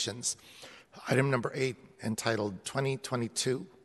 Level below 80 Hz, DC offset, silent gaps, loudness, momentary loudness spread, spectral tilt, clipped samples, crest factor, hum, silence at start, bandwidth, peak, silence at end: -70 dBFS; under 0.1%; none; -32 LUFS; 14 LU; -4 dB/octave; under 0.1%; 22 dB; none; 0 s; 12 kHz; -12 dBFS; 0.15 s